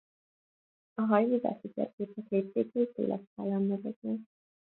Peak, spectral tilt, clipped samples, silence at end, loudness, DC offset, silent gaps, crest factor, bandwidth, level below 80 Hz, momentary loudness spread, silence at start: -12 dBFS; -11.5 dB/octave; under 0.1%; 0.55 s; -32 LUFS; under 0.1%; 1.93-1.98 s, 3.27-3.36 s, 3.96-4.02 s; 22 dB; 4.2 kHz; -80 dBFS; 11 LU; 1 s